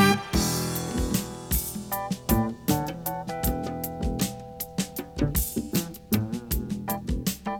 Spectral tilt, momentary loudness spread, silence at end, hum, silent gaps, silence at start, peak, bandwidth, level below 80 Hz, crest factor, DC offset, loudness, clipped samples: -4.5 dB/octave; 6 LU; 0 s; none; none; 0 s; -6 dBFS; over 20 kHz; -36 dBFS; 22 dB; under 0.1%; -28 LUFS; under 0.1%